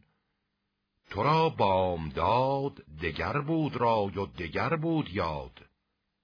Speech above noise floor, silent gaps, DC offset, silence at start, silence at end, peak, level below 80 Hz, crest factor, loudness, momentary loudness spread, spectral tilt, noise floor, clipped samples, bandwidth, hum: 52 dB; none; under 0.1%; 1.1 s; 0.75 s; -12 dBFS; -52 dBFS; 18 dB; -29 LUFS; 10 LU; -8 dB/octave; -81 dBFS; under 0.1%; 5.4 kHz; none